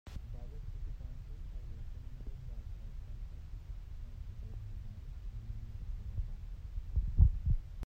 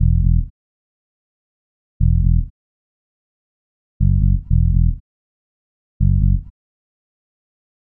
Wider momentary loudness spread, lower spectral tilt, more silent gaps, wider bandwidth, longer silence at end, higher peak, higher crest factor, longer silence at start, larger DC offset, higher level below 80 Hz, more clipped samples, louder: first, 14 LU vs 7 LU; second, -8.5 dB/octave vs -19 dB/octave; second, none vs 0.50-2.00 s, 2.50-4.00 s, 5.00-6.00 s; first, 5.8 kHz vs 0.4 kHz; second, 0 s vs 1.5 s; second, -14 dBFS vs -4 dBFS; first, 24 dB vs 16 dB; about the same, 0.05 s vs 0 s; neither; second, -40 dBFS vs -22 dBFS; neither; second, -42 LUFS vs -18 LUFS